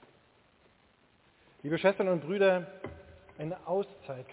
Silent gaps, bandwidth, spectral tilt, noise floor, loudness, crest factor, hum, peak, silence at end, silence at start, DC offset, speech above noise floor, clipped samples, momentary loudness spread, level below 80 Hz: none; 4 kHz; -5 dB/octave; -66 dBFS; -31 LUFS; 20 dB; none; -12 dBFS; 0 s; 1.65 s; under 0.1%; 36 dB; under 0.1%; 18 LU; -66 dBFS